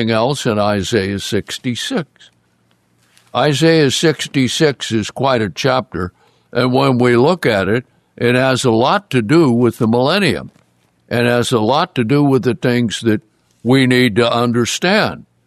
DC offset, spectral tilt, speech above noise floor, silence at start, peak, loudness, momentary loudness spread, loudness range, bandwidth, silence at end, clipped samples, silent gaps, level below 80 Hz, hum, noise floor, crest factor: under 0.1%; -5.5 dB/octave; 44 dB; 0 s; 0 dBFS; -15 LUFS; 9 LU; 3 LU; 14 kHz; 0.25 s; under 0.1%; none; -52 dBFS; none; -58 dBFS; 14 dB